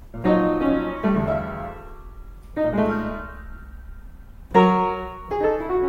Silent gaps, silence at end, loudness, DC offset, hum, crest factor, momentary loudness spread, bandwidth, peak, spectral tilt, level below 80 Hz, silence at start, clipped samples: none; 0 s; -22 LUFS; under 0.1%; none; 20 dB; 23 LU; 7.2 kHz; -4 dBFS; -8.5 dB/octave; -40 dBFS; 0 s; under 0.1%